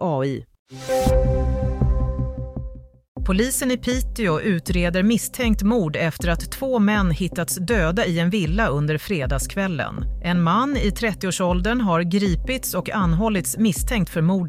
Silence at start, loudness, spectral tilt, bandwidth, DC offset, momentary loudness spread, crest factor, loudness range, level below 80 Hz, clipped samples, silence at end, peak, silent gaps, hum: 0 s; -22 LUFS; -5.5 dB/octave; 16 kHz; under 0.1%; 7 LU; 14 dB; 2 LU; -28 dBFS; under 0.1%; 0 s; -6 dBFS; 0.59-0.66 s, 3.08-3.15 s; none